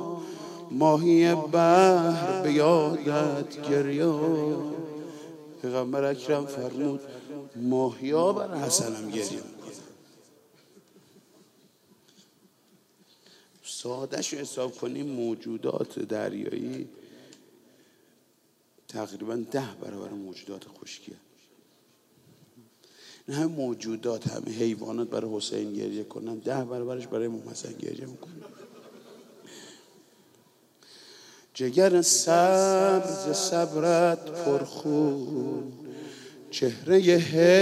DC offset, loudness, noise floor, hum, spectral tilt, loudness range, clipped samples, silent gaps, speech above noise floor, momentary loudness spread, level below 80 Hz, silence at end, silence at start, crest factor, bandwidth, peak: under 0.1%; -26 LUFS; -66 dBFS; none; -4.5 dB/octave; 17 LU; under 0.1%; none; 40 dB; 22 LU; -78 dBFS; 0 s; 0 s; 20 dB; 15 kHz; -6 dBFS